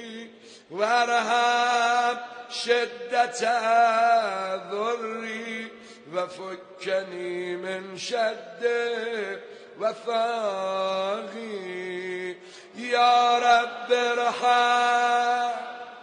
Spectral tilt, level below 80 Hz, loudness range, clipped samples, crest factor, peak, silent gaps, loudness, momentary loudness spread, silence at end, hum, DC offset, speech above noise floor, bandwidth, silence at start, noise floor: -2.5 dB/octave; -78 dBFS; 9 LU; under 0.1%; 16 dB; -8 dBFS; none; -25 LUFS; 15 LU; 0 s; none; under 0.1%; 21 dB; 10 kHz; 0 s; -46 dBFS